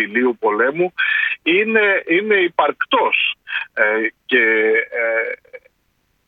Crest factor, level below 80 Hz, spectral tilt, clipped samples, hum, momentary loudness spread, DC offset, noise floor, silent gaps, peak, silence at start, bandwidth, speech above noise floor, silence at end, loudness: 16 dB; -68 dBFS; -6.5 dB/octave; under 0.1%; none; 6 LU; under 0.1%; -65 dBFS; none; -2 dBFS; 0 s; 4.7 kHz; 48 dB; 0.7 s; -16 LUFS